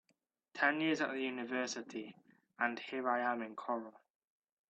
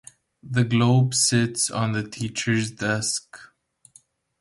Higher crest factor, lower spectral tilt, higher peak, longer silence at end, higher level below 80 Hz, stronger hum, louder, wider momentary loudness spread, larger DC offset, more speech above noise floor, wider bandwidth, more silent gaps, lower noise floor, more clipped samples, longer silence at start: first, 22 dB vs 16 dB; about the same, -3.5 dB/octave vs -4 dB/octave; second, -18 dBFS vs -8 dBFS; second, 0.8 s vs 0.95 s; second, -88 dBFS vs -58 dBFS; neither; second, -37 LUFS vs -22 LUFS; first, 14 LU vs 9 LU; neither; first, 44 dB vs 35 dB; second, 8.4 kHz vs 11.5 kHz; neither; first, -81 dBFS vs -57 dBFS; neither; about the same, 0.55 s vs 0.45 s